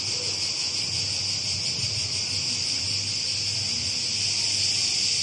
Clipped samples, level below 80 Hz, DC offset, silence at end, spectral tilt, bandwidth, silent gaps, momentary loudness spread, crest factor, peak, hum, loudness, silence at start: under 0.1%; -60 dBFS; under 0.1%; 0 s; -0.5 dB/octave; 11.5 kHz; none; 3 LU; 14 dB; -12 dBFS; none; -23 LUFS; 0 s